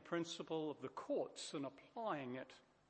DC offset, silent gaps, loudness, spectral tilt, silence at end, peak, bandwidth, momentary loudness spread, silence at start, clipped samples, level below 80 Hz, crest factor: under 0.1%; none; -46 LUFS; -4.5 dB/octave; 0.3 s; -28 dBFS; 8.4 kHz; 7 LU; 0 s; under 0.1%; -88 dBFS; 18 dB